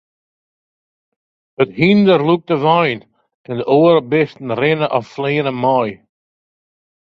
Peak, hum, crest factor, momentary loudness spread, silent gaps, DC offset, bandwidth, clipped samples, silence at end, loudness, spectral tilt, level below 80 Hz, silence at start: 0 dBFS; none; 16 dB; 8 LU; 3.34-3.44 s; under 0.1%; 6.4 kHz; under 0.1%; 1.05 s; -15 LUFS; -8.5 dB/octave; -58 dBFS; 1.6 s